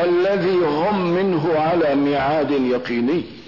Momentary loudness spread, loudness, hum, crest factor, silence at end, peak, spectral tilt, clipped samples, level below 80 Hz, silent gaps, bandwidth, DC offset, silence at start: 3 LU; -19 LUFS; none; 8 dB; 0.05 s; -10 dBFS; -8 dB/octave; under 0.1%; -54 dBFS; none; 6 kHz; 0.3%; 0 s